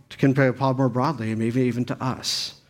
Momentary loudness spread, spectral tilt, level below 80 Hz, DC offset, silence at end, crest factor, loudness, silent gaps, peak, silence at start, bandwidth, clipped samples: 6 LU; -5.5 dB/octave; -60 dBFS; under 0.1%; 0.15 s; 18 dB; -23 LUFS; none; -6 dBFS; 0.1 s; 16 kHz; under 0.1%